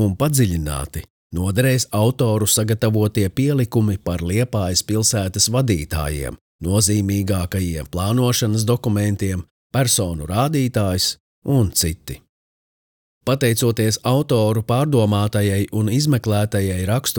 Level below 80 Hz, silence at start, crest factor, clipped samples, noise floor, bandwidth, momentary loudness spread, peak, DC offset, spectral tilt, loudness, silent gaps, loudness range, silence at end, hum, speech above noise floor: -42 dBFS; 0 s; 16 dB; under 0.1%; under -90 dBFS; over 20 kHz; 8 LU; -2 dBFS; under 0.1%; -5 dB/octave; -19 LUFS; 1.10-1.30 s, 6.41-6.59 s, 9.51-9.70 s, 11.20-11.42 s, 12.29-13.21 s; 2 LU; 0 s; none; over 72 dB